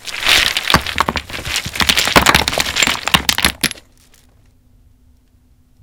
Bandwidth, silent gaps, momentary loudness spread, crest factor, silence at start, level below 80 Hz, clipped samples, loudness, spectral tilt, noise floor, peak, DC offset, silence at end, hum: over 20 kHz; none; 10 LU; 18 dB; 0 s; -34 dBFS; 0.2%; -13 LUFS; -1.5 dB/octave; -52 dBFS; 0 dBFS; under 0.1%; 2.1 s; none